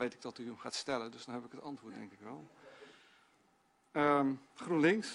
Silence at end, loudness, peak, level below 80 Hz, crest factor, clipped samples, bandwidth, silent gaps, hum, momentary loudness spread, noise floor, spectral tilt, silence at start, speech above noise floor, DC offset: 0 s; -36 LUFS; -18 dBFS; -80 dBFS; 20 dB; under 0.1%; 11.5 kHz; none; none; 22 LU; -72 dBFS; -5 dB/octave; 0 s; 36 dB; under 0.1%